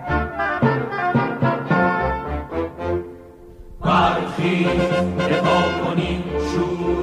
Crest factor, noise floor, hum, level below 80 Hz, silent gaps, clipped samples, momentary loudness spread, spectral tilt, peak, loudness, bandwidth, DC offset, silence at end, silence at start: 16 dB; -41 dBFS; none; -38 dBFS; none; under 0.1%; 8 LU; -7 dB/octave; -6 dBFS; -20 LUFS; 11 kHz; under 0.1%; 0 s; 0 s